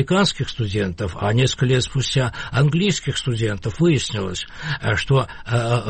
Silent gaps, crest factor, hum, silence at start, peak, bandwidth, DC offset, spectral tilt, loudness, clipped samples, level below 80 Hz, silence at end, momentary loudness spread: none; 12 dB; none; 0 s; -8 dBFS; 8.8 kHz; under 0.1%; -5.5 dB/octave; -21 LUFS; under 0.1%; -40 dBFS; 0 s; 7 LU